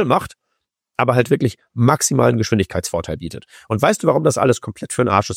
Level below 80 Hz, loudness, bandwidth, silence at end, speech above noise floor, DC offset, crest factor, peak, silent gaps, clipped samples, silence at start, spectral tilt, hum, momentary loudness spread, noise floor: -46 dBFS; -18 LUFS; 16.5 kHz; 0 s; 58 dB; under 0.1%; 16 dB; -2 dBFS; none; under 0.1%; 0 s; -5.5 dB/octave; none; 13 LU; -75 dBFS